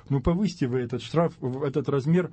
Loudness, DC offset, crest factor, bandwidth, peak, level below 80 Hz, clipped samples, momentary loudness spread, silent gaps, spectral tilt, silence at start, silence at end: -26 LUFS; under 0.1%; 16 dB; 8.6 kHz; -10 dBFS; -44 dBFS; under 0.1%; 4 LU; none; -8 dB/octave; 0.1 s; 0 s